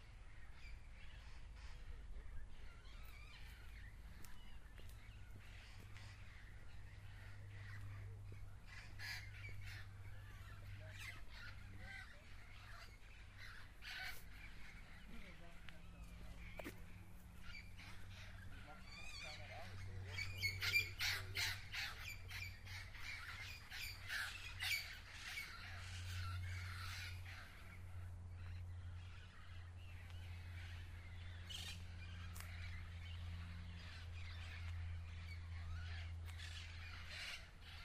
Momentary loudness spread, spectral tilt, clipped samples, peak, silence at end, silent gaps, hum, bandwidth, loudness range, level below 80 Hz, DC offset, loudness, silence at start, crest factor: 14 LU; -3 dB/octave; under 0.1%; -26 dBFS; 0 s; none; none; 15.5 kHz; 15 LU; -58 dBFS; under 0.1%; -51 LUFS; 0 s; 24 dB